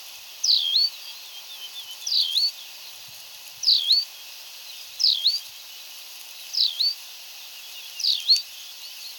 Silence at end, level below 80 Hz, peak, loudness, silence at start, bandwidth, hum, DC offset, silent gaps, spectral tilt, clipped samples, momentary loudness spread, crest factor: 0 s; -82 dBFS; -6 dBFS; -21 LUFS; 0 s; 17.5 kHz; none; under 0.1%; none; 4.5 dB/octave; under 0.1%; 20 LU; 20 dB